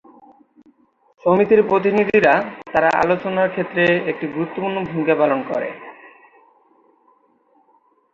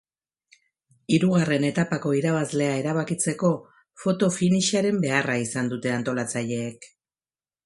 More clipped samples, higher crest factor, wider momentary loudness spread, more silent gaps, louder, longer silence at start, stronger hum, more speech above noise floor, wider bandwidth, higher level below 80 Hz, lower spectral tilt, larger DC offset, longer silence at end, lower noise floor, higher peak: neither; about the same, 18 dB vs 20 dB; first, 10 LU vs 7 LU; neither; first, -18 LUFS vs -24 LUFS; first, 1.25 s vs 1.1 s; neither; second, 41 dB vs over 67 dB; second, 7.4 kHz vs 11.5 kHz; first, -58 dBFS vs -66 dBFS; first, -7.5 dB/octave vs -5 dB/octave; neither; first, 2.05 s vs 0.8 s; second, -59 dBFS vs under -90 dBFS; first, -2 dBFS vs -6 dBFS